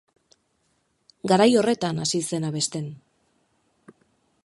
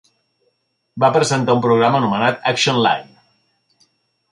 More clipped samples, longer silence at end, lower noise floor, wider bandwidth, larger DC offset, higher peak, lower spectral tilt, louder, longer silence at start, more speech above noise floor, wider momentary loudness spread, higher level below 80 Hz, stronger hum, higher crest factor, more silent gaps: neither; first, 1.5 s vs 1.25 s; about the same, -70 dBFS vs -67 dBFS; about the same, 11.5 kHz vs 11.5 kHz; neither; about the same, -4 dBFS vs -2 dBFS; about the same, -4.5 dB/octave vs -4.5 dB/octave; second, -23 LUFS vs -16 LUFS; first, 1.25 s vs 0.95 s; second, 48 dB vs 52 dB; first, 16 LU vs 4 LU; second, -68 dBFS vs -60 dBFS; neither; first, 22 dB vs 16 dB; neither